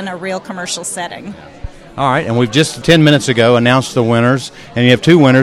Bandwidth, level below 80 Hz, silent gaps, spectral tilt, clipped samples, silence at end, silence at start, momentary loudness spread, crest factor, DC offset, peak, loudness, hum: 14.5 kHz; -40 dBFS; none; -5.5 dB/octave; 0.2%; 0 s; 0 s; 17 LU; 12 dB; under 0.1%; 0 dBFS; -12 LUFS; none